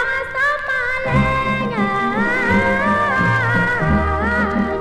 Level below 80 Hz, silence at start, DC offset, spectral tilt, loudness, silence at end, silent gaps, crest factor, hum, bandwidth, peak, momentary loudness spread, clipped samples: -32 dBFS; 0 s; under 0.1%; -7 dB/octave; -17 LUFS; 0 s; none; 14 dB; none; 12.5 kHz; -4 dBFS; 3 LU; under 0.1%